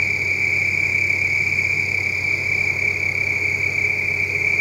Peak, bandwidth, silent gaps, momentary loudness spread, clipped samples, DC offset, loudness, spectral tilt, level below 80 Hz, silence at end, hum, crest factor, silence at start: -8 dBFS; 16 kHz; none; 2 LU; under 0.1%; under 0.1%; -18 LUFS; -3.5 dB/octave; -52 dBFS; 0 s; none; 14 dB; 0 s